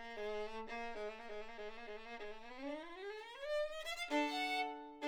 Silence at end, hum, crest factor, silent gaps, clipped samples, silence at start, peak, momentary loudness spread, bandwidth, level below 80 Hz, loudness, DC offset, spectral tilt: 0 s; none; 18 dB; none; under 0.1%; 0 s; -26 dBFS; 12 LU; over 20 kHz; -64 dBFS; -44 LUFS; under 0.1%; -2.5 dB/octave